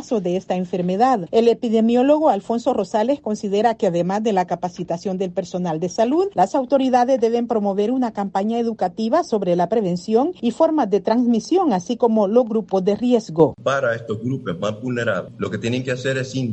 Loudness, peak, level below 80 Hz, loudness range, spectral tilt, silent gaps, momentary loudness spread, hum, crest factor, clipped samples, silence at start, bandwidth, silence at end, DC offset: -20 LUFS; -2 dBFS; -60 dBFS; 3 LU; -6.5 dB/octave; none; 8 LU; none; 16 dB; under 0.1%; 0 s; 8.6 kHz; 0 s; under 0.1%